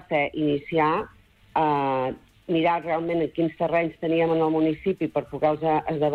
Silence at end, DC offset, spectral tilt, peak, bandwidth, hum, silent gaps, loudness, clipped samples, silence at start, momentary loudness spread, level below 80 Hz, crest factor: 0 s; under 0.1%; -8.5 dB/octave; -10 dBFS; 4.8 kHz; none; none; -24 LUFS; under 0.1%; 0.1 s; 6 LU; -56 dBFS; 14 dB